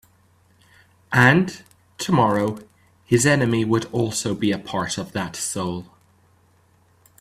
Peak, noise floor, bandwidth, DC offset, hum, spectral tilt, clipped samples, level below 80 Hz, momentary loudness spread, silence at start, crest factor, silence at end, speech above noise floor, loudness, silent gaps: 0 dBFS; -58 dBFS; 15 kHz; under 0.1%; none; -5 dB/octave; under 0.1%; -56 dBFS; 13 LU; 1.1 s; 22 dB; 1.35 s; 38 dB; -21 LUFS; none